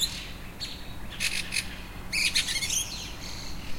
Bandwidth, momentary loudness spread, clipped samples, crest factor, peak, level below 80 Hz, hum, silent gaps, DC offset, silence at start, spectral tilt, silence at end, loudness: 16.5 kHz; 16 LU; under 0.1%; 20 dB; -12 dBFS; -44 dBFS; none; none; under 0.1%; 0 s; -0.5 dB/octave; 0 s; -29 LUFS